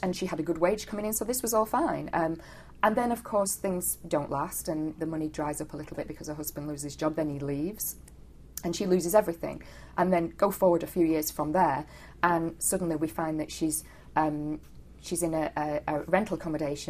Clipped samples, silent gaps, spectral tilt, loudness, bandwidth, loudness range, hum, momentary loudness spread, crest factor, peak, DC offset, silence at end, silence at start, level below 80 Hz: under 0.1%; none; -5 dB/octave; -29 LUFS; 15 kHz; 6 LU; none; 11 LU; 22 dB; -8 dBFS; under 0.1%; 0 s; 0 s; -52 dBFS